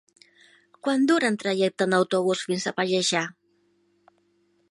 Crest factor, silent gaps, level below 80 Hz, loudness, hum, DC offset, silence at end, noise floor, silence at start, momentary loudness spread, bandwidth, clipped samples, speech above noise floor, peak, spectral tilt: 20 dB; none; -76 dBFS; -24 LUFS; none; under 0.1%; 1.4 s; -67 dBFS; 0.85 s; 6 LU; 11.5 kHz; under 0.1%; 43 dB; -6 dBFS; -4 dB/octave